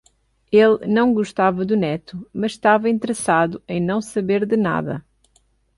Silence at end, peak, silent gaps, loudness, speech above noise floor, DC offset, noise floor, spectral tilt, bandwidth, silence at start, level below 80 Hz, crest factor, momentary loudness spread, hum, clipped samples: 0.8 s; -4 dBFS; none; -19 LUFS; 43 dB; under 0.1%; -61 dBFS; -6 dB/octave; 11.5 kHz; 0.5 s; -56 dBFS; 16 dB; 10 LU; none; under 0.1%